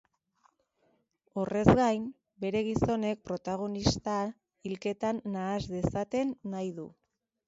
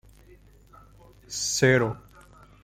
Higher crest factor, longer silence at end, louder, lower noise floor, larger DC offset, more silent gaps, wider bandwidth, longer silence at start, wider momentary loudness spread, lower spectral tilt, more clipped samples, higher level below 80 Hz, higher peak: about the same, 28 dB vs 24 dB; about the same, 0.55 s vs 0.65 s; second, -31 LUFS vs -24 LUFS; first, -73 dBFS vs -54 dBFS; neither; neither; second, 8 kHz vs 15.5 kHz; about the same, 1.35 s vs 1.3 s; second, 13 LU vs 16 LU; first, -6.5 dB/octave vs -4 dB/octave; neither; about the same, -50 dBFS vs -54 dBFS; about the same, -4 dBFS vs -6 dBFS